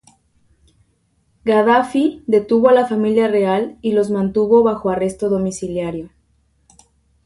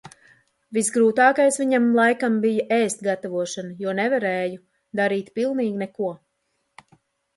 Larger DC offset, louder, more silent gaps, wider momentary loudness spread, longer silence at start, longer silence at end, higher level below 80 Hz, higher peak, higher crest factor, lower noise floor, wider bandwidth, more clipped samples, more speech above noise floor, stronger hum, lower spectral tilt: neither; first, -17 LUFS vs -22 LUFS; neither; second, 10 LU vs 13 LU; first, 1.45 s vs 0.05 s; about the same, 1.2 s vs 1.2 s; first, -52 dBFS vs -72 dBFS; about the same, -2 dBFS vs -4 dBFS; about the same, 16 dB vs 18 dB; second, -62 dBFS vs -73 dBFS; about the same, 11.5 kHz vs 11.5 kHz; neither; second, 46 dB vs 52 dB; neither; first, -6.5 dB/octave vs -4.5 dB/octave